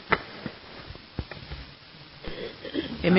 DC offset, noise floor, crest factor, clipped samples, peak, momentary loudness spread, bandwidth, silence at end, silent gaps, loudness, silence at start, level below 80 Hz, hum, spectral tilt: under 0.1%; -48 dBFS; 28 dB; under 0.1%; -4 dBFS; 16 LU; 5.8 kHz; 0 s; none; -35 LUFS; 0 s; -48 dBFS; none; -10 dB/octave